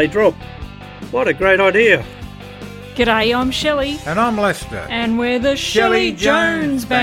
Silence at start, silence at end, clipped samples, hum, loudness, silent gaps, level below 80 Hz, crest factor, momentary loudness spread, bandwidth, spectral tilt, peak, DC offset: 0 s; 0 s; under 0.1%; none; -16 LUFS; none; -38 dBFS; 16 dB; 20 LU; 16.5 kHz; -4.5 dB/octave; 0 dBFS; under 0.1%